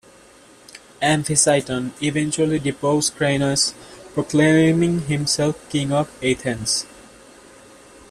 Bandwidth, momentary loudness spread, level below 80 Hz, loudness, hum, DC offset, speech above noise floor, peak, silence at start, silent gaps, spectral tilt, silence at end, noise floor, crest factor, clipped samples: 14 kHz; 8 LU; -52 dBFS; -20 LUFS; none; under 0.1%; 29 dB; -2 dBFS; 0.75 s; none; -4 dB/octave; 1.1 s; -48 dBFS; 20 dB; under 0.1%